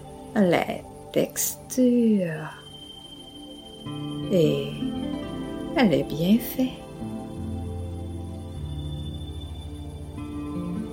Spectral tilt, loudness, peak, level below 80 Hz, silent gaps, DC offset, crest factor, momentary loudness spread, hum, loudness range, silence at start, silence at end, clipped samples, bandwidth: -5.5 dB/octave; -27 LUFS; -6 dBFS; -44 dBFS; none; under 0.1%; 22 dB; 17 LU; none; 10 LU; 0 s; 0 s; under 0.1%; 16.5 kHz